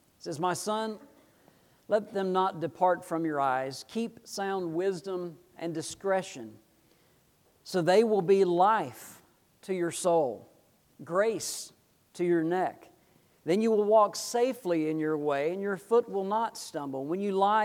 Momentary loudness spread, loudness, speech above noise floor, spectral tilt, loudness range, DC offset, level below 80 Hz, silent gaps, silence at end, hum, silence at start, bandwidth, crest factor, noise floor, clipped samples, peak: 14 LU; -29 LUFS; 37 dB; -5 dB/octave; 6 LU; under 0.1%; -78 dBFS; none; 0 s; none; 0.25 s; 18 kHz; 18 dB; -66 dBFS; under 0.1%; -12 dBFS